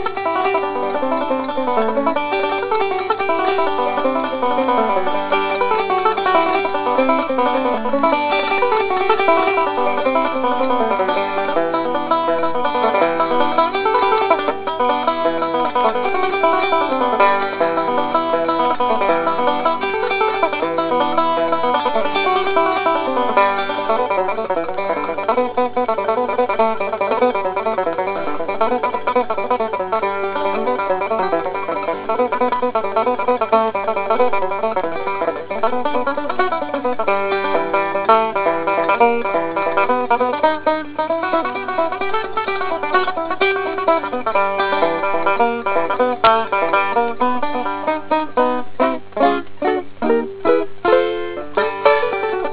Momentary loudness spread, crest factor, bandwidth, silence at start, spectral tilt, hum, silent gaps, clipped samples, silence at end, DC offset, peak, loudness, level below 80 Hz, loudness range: 5 LU; 18 dB; 4 kHz; 0 s; -8 dB/octave; 50 Hz at -50 dBFS; none; under 0.1%; 0 s; under 0.1%; 0 dBFS; -18 LUFS; -56 dBFS; 3 LU